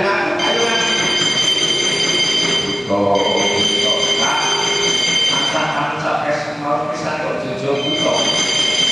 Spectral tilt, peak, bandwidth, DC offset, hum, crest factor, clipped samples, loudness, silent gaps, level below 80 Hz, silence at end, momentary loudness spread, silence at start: -2 dB/octave; -4 dBFS; 13 kHz; under 0.1%; none; 14 dB; under 0.1%; -15 LUFS; none; -52 dBFS; 0 s; 7 LU; 0 s